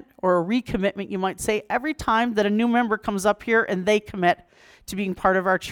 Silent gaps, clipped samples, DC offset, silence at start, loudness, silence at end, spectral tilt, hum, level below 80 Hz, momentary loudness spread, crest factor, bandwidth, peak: none; under 0.1%; under 0.1%; 0.25 s; -23 LUFS; 0 s; -5 dB/octave; none; -50 dBFS; 7 LU; 18 dB; 19 kHz; -4 dBFS